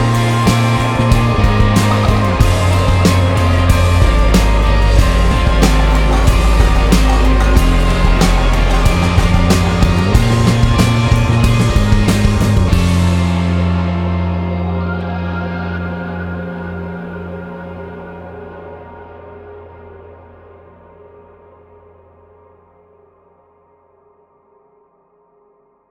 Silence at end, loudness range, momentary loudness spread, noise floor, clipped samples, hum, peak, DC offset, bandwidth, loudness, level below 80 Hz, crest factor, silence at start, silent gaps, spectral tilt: 5.95 s; 16 LU; 16 LU; -54 dBFS; under 0.1%; none; 0 dBFS; under 0.1%; 16 kHz; -13 LUFS; -16 dBFS; 12 dB; 0 s; none; -6 dB/octave